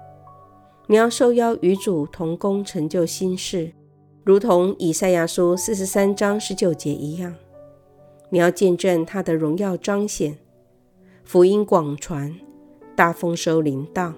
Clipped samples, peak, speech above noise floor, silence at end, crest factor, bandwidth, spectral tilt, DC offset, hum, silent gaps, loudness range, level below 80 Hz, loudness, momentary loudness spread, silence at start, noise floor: under 0.1%; 0 dBFS; 37 dB; 0 s; 20 dB; 18 kHz; -5.5 dB/octave; under 0.1%; none; none; 3 LU; -54 dBFS; -20 LUFS; 11 LU; 0 s; -56 dBFS